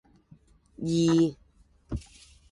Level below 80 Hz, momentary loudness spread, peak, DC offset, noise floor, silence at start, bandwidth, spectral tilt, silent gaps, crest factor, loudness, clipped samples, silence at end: -50 dBFS; 16 LU; -14 dBFS; under 0.1%; -61 dBFS; 0.8 s; 11 kHz; -6.5 dB/octave; none; 16 dB; -27 LUFS; under 0.1%; 0.5 s